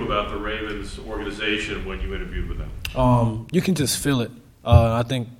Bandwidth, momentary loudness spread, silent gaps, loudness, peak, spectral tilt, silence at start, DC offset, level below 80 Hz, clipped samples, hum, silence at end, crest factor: 16.5 kHz; 14 LU; none; -23 LUFS; 0 dBFS; -5.5 dB/octave; 0 s; under 0.1%; -32 dBFS; under 0.1%; none; 0.05 s; 22 dB